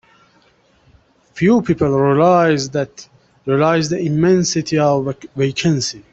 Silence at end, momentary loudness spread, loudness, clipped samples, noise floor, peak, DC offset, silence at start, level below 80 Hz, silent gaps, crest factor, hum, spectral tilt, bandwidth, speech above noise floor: 0.15 s; 9 LU; -16 LUFS; under 0.1%; -55 dBFS; -2 dBFS; under 0.1%; 1.35 s; -50 dBFS; none; 14 dB; none; -5.5 dB/octave; 8.4 kHz; 40 dB